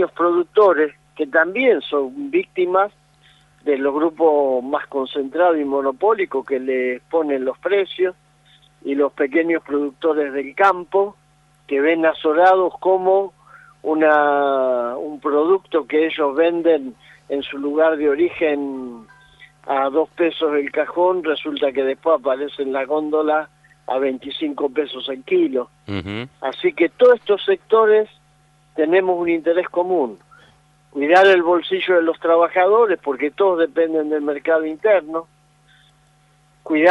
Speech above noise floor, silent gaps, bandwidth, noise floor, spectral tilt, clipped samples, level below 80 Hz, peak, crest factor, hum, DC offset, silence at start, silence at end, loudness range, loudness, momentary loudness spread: 38 dB; none; 7.2 kHz; -56 dBFS; -6 dB/octave; under 0.1%; -64 dBFS; -2 dBFS; 16 dB; none; under 0.1%; 0 s; 0 s; 4 LU; -18 LUFS; 11 LU